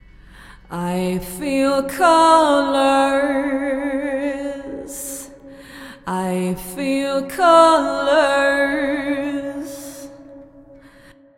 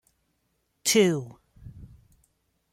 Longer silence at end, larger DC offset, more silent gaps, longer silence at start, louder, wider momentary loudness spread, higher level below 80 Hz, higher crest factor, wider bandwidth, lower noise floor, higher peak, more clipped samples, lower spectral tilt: second, 0.65 s vs 0.85 s; neither; neither; second, 0.4 s vs 0.85 s; first, -18 LUFS vs -24 LUFS; second, 20 LU vs 26 LU; first, -48 dBFS vs -60 dBFS; about the same, 20 dB vs 22 dB; about the same, 16.5 kHz vs 16.5 kHz; second, -47 dBFS vs -74 dBFS; first, 0 dBFS vs -8 dBFS; neither; about the same, -4.5 dB/octave vs -3.5 dB/octave